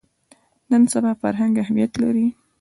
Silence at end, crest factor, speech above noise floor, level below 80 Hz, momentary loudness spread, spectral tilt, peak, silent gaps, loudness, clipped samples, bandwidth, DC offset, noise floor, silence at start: 0.3 s; 14 dB; 39 dB; -58 dBFS; 5 LU; -6 dB/octave; -8 dBFS; none; -20 LUFS; under 0.1%; 11.5 kHz; under 0.1%; -57 dBFS; 0.7 s